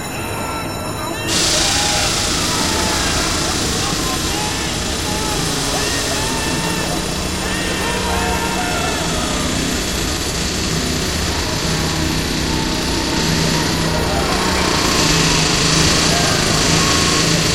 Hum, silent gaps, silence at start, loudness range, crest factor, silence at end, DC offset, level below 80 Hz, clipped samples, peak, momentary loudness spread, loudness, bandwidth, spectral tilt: none; none; 0 s; 4 LU; 16 dB; 0 s; 1%; -30 dBFS; under 0.1%; -2 dBFS; 6 LU; -16 LUFS; 16.5 kHz; -3 dB/octave